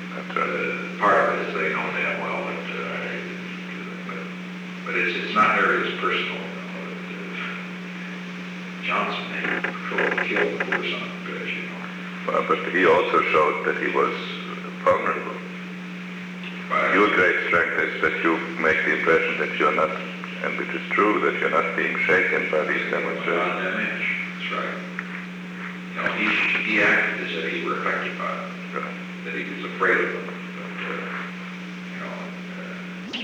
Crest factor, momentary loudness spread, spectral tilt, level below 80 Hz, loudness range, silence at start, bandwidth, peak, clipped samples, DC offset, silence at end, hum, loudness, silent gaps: 18 dB; 14 LU; -5.5 dB/octave; -66 dBFS; 6 LU; 0 s; 11.5 kHz; -6 dBFS; under 0.1%; under 0.1%; 0 s; none; -23 LUFS; none